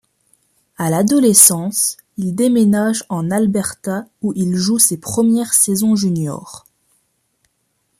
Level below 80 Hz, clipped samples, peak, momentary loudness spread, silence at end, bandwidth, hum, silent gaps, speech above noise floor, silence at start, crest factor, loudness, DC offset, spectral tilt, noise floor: -56 dBFS; under 0.1%; 0 dBFS; 14 LU; 1.4 s; 15.5 kHz; none; none; 51 dB; 0.8 s; 16 dB; -15 LUFS; under 0.1%; -4 dB/octave; -67 dBFS